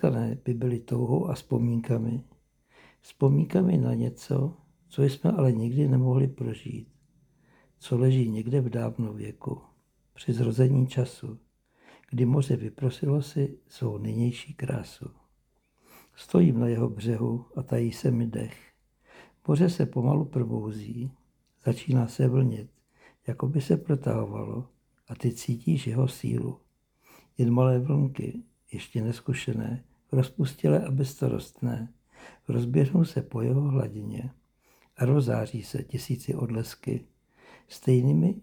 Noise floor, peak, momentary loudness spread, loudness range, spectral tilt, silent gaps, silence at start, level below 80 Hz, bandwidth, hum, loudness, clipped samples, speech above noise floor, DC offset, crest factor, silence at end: -70 dBFS; -8 dBFS; 14 LU; 3 LU; -8.5 dB/octave; none; 0 s; -58 dBFS; 14.5 kHz; none; -27 LUFS; under 0.1%; 44 dB; under 0.1%; 20 dB; 0 s